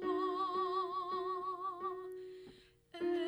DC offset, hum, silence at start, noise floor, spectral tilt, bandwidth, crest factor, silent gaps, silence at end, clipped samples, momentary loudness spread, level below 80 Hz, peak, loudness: under 0.1%; none; 0 s; -60 dBFS; -5.5 dB/octave; over 20 kHz; 14 dB; none; 0 s; under 0.1%; 17 LU; -76 dBFS; -26 dBFS; -39 LUFS